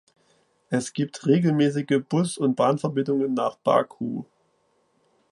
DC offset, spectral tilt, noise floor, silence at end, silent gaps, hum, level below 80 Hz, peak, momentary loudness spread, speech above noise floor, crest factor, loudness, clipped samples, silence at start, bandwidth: under 0.1%; -6.5 dB/octave; -67 dBFS; 1.1 s; none; none; -70 dBFS; -6 dBFS; 8 LU; 44 dB; 20 dB; -24 LUFS; under 0.1%; 0.7 s; 11.5 kHz